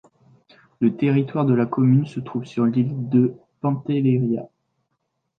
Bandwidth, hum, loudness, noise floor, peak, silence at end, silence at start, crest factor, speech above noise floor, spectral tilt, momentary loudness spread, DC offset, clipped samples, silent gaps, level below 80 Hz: 6.4 kHz; none; -21 LUFS; -75 dBFS; -6 dBFS; 0.9 s; 0.8 s; 16 dB; 55 dB; -10 dB/octave; 9 LU; under 0.1%; under 0.1%; none; -64 dBFS